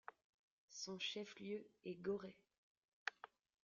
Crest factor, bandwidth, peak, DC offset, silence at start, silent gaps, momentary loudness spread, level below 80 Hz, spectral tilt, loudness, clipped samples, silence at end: 28 dB; 7.4 kHz; -24 dBFS; under 0.1%; 0.1 s; 0.24-0.68 s, 2.58-3.06 s; 14 LU; -86 dBFS; -2.5 dB/octave; -49 LUFS; under 0.1%; 0.35 s